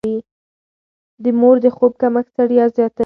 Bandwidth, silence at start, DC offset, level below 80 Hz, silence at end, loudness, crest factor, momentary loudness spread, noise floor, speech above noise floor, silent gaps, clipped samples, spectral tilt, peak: 4.3 kHz; 0.05 s; under 0.1%; -60 dBFS; 0 s; -15 LUFS; 16 dB; 11 LU; under -90 dBFS; over 76 dB; 0.31-1.18 s; under 0.1%; -9 dB/octave; 0 dBFS